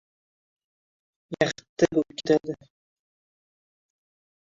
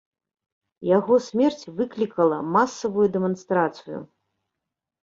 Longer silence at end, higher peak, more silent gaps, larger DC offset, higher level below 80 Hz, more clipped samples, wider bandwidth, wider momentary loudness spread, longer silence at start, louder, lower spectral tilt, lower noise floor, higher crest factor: first, 1.95 s vs 1 s; about the same, -6 dBFS vs -6 dBFS; first, 1.69-1.76 s vs none; neither; about the same, -62 dBFS vs -66 dBFS; neither; about the same, 7.8 kHz vs 7.6 kHz; first, 15 LU vs 11 LU; first, 1.3 s vs 0.8 s; about the same, -25 LUFS vs -23 LUFS; about the same, -5.5 dB/octave vs -6.5 dB/octave; first, under -90 dBFS vs -85 dBFS; first, 24 dB vs 18 dB